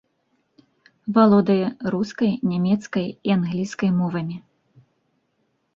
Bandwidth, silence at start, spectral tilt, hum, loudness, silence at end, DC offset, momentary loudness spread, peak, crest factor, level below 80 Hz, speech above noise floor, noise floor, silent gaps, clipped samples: 7.4 kHz; 1.05 s; -7.5 dB/octave; none; -21 LUFS; 1.35 s; under 0.1%; 12 LU; -4 dBFS; 18 dB; -62 dBFS; 50 dB; -70 dBFS; none; under 0.1%